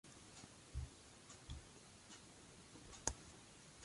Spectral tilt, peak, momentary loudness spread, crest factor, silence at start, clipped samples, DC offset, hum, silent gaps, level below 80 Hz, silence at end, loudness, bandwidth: -3 dB/octave; -18 dBFS; 14 LU; 38 dB; 0.05 s; under 0.1%; under 0.1%; none; none; -60 dBFS; 0 s; -54 LUFS; 11.5 kHz